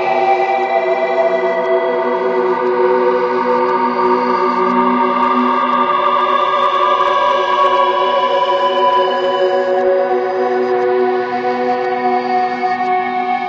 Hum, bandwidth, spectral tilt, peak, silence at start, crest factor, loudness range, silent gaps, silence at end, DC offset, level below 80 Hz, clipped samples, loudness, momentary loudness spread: none; 7.2 kHz; -5.5 dB/octave; 0 dBFS; 0 s; 14 dB; 2 LU; none; 0 s; under 0.1%; -62 dBFS; under 0.1%; -14 LUFS; 3 LU